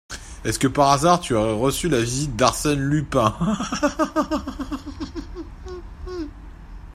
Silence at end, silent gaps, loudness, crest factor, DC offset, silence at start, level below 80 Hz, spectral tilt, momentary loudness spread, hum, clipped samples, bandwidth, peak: 0 s; none; -21 LUFS; 20 dB; under 0.1%; 0.1 s; -38 dBFS; -5 dB/octave; 19 LU; none; under 0.1%; 16 kHz; -2 dBFS